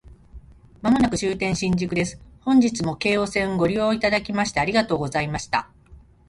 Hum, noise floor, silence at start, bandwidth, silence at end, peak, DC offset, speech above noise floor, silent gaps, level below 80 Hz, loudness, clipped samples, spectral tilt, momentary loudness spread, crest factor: none; -49 dBFS; 0.05 s; 11.5 kHz; 0.3 s; -6 dBFS; under 0.1%; 27 dB; none; -46 dBFS; -22 LUFS; under 0.1%; -5 dB/octave; 7 LU; 16 dB